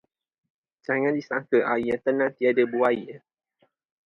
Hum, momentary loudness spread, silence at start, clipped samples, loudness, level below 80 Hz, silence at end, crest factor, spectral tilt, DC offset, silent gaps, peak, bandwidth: none; 7 LU; 0.9 s; under 0.1%; -24 LUFS; -66 dBFS; 0.9 s; 18 dB; -7.5 dB/octave; under 0.1%; none; -8 dBFS; 6.6 kHz